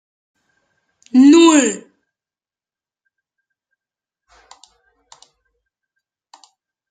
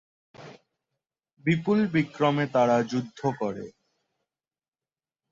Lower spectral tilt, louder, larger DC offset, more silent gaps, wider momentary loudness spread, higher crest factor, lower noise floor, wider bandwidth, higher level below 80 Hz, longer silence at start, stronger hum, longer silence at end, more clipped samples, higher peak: second, -2.5 dB/octave vs -7 dB/octave; first, -11 LUFS vs -26 LUFS; neither; neither; first, 14 LU vs 10 LU; about the same, 18 dB vs 20 dB; about the same, under -90 dBFS vs under -90 dBFS; first, 9.4 kHz vs 7.6 kHz; about the same, -66 dBFS vs -66 dBFS; first, 1.15 s vs 0.4 s; neither; first, 5.15 s vs 1.6 s; neither; first, -2 dBFS vs -10 dBFS